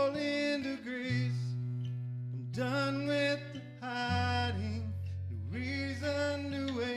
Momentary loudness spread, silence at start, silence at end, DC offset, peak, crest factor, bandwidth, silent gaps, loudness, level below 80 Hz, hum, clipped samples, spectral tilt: 8 LU; 0 s; 0 s; under 0.1%; -20 dBFS; 14 dB; 12 kHz; none; -35 LUFS; -70 dBFS; none; under 0.1%; -6.5 dB/octave